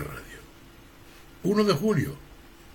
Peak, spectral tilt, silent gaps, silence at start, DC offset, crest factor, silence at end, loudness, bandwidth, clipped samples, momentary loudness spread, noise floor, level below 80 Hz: -10 dBFS; -6.5 dB/octave; none; 0 s; under 0.1%; 18 dB; 0.05 s; -26 LUFS; 17 kHz; under 0.1%; 22 LU; -50 dBFS; -52 dBFS